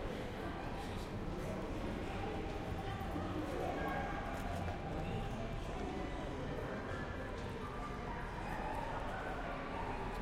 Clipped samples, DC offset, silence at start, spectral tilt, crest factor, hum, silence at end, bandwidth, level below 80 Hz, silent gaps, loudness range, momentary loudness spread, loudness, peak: under 0.1%; under 0.1%; 0 s; -6.5 dB/octave; 14 dB; none; 0 s; 16 kHz; -48 dBFS; none; 2 LU; 4 LU; -43 LUFS; -28 dBFS